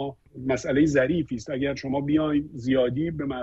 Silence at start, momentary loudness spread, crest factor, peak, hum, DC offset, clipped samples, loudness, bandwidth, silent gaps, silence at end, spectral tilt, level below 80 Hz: 0 s; 7 LU; 16 dB; -8 dBFS; none; under 0.1%; under 0.1%; -25 LUFS; 8 kHz; none; 0 s; -6.5 dB/octave; -50 dBFS